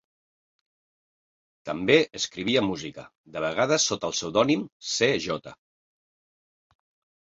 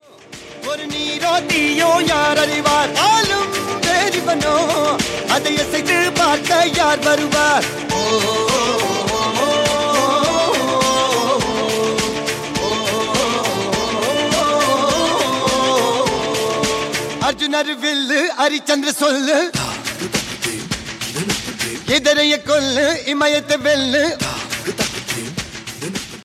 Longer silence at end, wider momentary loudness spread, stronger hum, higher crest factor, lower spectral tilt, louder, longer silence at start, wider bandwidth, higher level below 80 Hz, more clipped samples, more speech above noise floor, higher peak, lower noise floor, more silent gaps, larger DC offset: first, 1.7 s vs 0 s; first, 14 LU vs 9 LU; neither; first, 24 dB vs 16 dB; about the same, -3 dB/octave vs -2.5 dB/octave; second, -25 LUFS vs -17 LUFS; first, 1.65 s vs 0.3 s; second, 8.2 kHz vs 16.5 kHz; second, -62 dBFS vs -46 dBFS; neither; first, over 64 dB vs 22 dB; about the same, -4 dBFS vs -2 dBFS; first, under -90 dBFS vs -38 dBFS; first, 3.18-3.24 s, 4.72-4.80 s vs none; neither